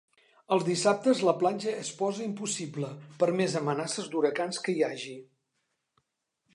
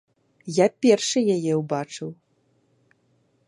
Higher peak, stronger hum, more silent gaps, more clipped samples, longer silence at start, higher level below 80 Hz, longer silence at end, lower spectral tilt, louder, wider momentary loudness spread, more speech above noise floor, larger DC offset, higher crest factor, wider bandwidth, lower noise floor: second, -10 dBFS vs -4 dBFS; neither; neither; neither; about the same, 0.5 s vs 0.45 s; second, -82 dBFS vs -74 dBFS; about the same, 1.3 s vs 1.35 s; about the same, -4.5 dB/octave vs -5 dB/octave; second, -29 LUFS vs -22 LUFS; second, 11 LU vs 17 LU; first, 52 dB vs 44 dB; neither; about the same, 20 dB vs 20 dB; about the same, 11.5 kHz vs 11.5 kHz; first, -81 dBFS vs -66 dBFS